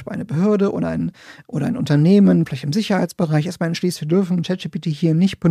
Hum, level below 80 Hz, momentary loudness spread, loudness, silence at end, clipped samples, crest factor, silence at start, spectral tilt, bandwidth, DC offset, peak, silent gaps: none; -54 dBFS; 11 LU; -19 LUFS; 0 s; under 0.1%; 14 dB; 0 s; -7.5 dB/octave; 14 kHz; under 0.1%; -4 dBFS; none